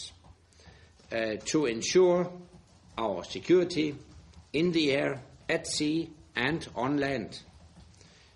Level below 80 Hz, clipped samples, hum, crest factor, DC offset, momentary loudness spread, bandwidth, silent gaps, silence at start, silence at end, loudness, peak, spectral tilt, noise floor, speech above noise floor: -60 dBFS; under 0.1%; none; 18 dB; under 0.1%; 14 LU; 11.5 kHz; none; 0 s; 0.55 s; -29 LUFS; -12 dBFS; -4.5 dB/octave; -57 dBFS; 28 dB